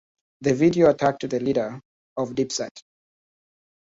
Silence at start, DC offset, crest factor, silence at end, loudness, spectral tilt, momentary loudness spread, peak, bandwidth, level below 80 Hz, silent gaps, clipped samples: 0.4 s; under 0.1%; 20 dB; 1.2 s; -23 LUFS; -5.5 dB/octave; 16 LU; -4 dBFS; 7.8 kHz; -60 dBFS; 1.85-2.16 s, 2.71-2.75 s; under 0.1%